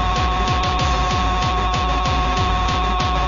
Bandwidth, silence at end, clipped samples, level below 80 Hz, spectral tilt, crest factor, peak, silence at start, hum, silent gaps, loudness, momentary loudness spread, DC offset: 7.4 kHz; 0 s; under 0.1%; -24 dBFS; -4.5 dB/octave; 12 dB; -6 dBFS; 0 s; none; none; -19 LUFS; 1 LU; under 0.1%